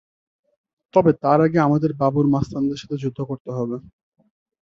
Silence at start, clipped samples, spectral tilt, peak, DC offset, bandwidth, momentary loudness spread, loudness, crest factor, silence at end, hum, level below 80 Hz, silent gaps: 0.95 s; under 0.1%; -8.5 dB/octave; -2 dBFS; under 0.1%; 7.4 kHz; 11 LU; -20 LUFS; 20 dB; 0.85 s; none; -52 dBFS; 3.40-3.45 s